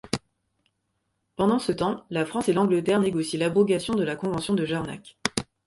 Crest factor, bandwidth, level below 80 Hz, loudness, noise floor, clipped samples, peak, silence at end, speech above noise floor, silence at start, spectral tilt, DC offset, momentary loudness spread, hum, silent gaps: 26 dB; 11.5 kHz; -56 dBFS; -25 LUFS; -76 dBFS; under 0.1%; 0 dBFS; 0.25 s; 52 dB; 0.05 s; -5.5 dB/octave; under 0.1%; 9 LU; none; none